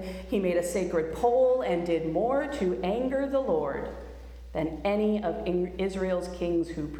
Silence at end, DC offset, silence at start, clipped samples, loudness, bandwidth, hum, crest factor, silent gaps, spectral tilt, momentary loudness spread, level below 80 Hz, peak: 0 s; under 0.1%; 0 s; under 0.1%; -28 LUFS; 14 kHz; none; 14 dB; none; -6.5 dB/octave; 8 LU; -46 dBFS; -14 dBFS